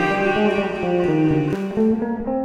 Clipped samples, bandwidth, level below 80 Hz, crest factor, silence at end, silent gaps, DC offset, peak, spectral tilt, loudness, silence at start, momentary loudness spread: under 0.1%; 10 kHz; -46 dBFS; 12 dB; 0 s; none; under 0.1%; -6 dBFS; -7.5 dB/octave; -20 LUFS; 0 s; 4 LU